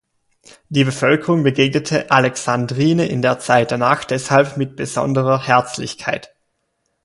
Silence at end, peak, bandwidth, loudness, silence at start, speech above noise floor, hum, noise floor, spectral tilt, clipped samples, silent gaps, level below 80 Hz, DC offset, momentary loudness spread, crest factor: 0.8 s; 0 dBFS; 11.5 kHz; -17 LUFS; 0.7 s; 53 dB; none; -70 dBFS; -5.5 dB/octave; under 0.1%; none; -56 dBFS; under 0.1%; 8 LU; 18 dB